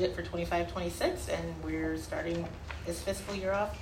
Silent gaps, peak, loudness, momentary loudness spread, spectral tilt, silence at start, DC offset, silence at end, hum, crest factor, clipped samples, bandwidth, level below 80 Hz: none; -16 dBFS; -35 LUFS; 5 LU; -5 dB/octave; 0 s; under 0.1%; 0 s; none; 18 dB; under 0.1%; 16 kHz; -46 dBFS